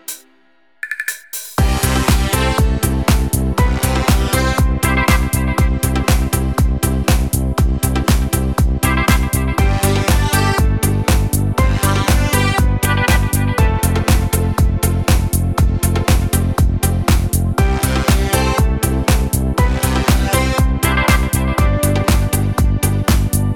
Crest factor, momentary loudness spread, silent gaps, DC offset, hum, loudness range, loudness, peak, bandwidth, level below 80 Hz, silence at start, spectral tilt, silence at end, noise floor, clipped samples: 14 dB; 3 LU; none; under 0.1%; none; 1 LU; -16 LUFS; 0 dBFS; 19 kHz; -18 dBFS; 0.1 s; -5 dB/octave; 0 s; -56 dBFS; under 0.1%